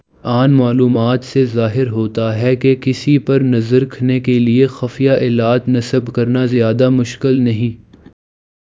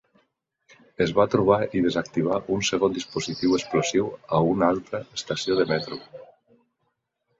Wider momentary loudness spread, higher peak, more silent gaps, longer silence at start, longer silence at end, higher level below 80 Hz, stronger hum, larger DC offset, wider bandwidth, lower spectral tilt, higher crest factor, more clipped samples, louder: second, 5 LU vs 9 LU; first, 0 dBFS vs -4 dBFS; neither; second, 0.25 s vs 1 s; second, 1 s vs 1.15 s; first, -50 dBFS vs -56 dBFS; neither; neither; about the same, 7.8 kHz vs 8 kHz; first, -8 dB/octave vs -5 dB/octave; second, 14 dB vs 22 dB; neither; first, -14 LUFS vs -24 LUFS